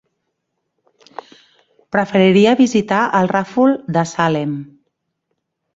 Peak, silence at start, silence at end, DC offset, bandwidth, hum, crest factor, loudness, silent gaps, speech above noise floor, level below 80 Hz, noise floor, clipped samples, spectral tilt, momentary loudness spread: -2 dBFS; 1.95 s; 1.1 s; under 0.1%; 7.8 kHz; none; 16 dB; -15 LUFS; none; 59 dB; -58 dBFS; -73 dBFS; under 0.1%; -6 dB/octave; 23 LU